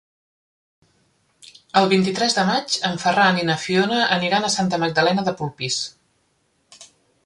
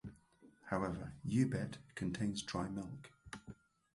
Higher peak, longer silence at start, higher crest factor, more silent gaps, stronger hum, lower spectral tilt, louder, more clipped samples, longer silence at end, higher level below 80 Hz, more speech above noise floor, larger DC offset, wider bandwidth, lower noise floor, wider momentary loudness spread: first, -2 dBFS vs -20 dBFS; first, 1.75 s vs 0.05 s; about the same, 20 dB vs 22 dB; neither; neither; second, -4 dB/octave vs -6 dB/octave; first, -19 LUFS vs -40 LUFS; neither; about the same, 0.4 s vs 0.4 s; about the same, -62 dBFS vs -62 dBFS; first, 46 dB vs 27 dB; neither; about the same, 11.5 kHz vs 11.5 kHz; about the same, -66 dBFS vs -66 dBFS; second, 7 LU vs 19 LU